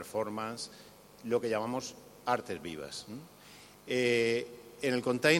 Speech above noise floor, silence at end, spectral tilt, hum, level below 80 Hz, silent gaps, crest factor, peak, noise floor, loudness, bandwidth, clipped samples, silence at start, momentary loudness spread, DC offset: 22 dB; 0 s; -4 dB/octave; 50 Hz at -65 dBFS; -72 dBFS; none; 24 dB; -10 dBFS; -55 dBFS; -34 LUFS; 16.5 kHz; under 0.1%; 0 s; 23 LU; under 0.1%